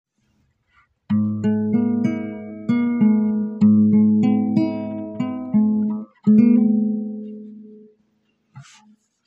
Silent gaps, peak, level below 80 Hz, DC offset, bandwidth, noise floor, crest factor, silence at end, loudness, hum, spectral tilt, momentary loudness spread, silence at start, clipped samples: none; -4 dBFS; -64 dBFS; under 0.1%; 5.2 kHz; -66 dBFS; 16 dB; 0.65 s; -19 LUFS; none; -10 dB/octave; 15 LU; 1.1 s; under 0.1%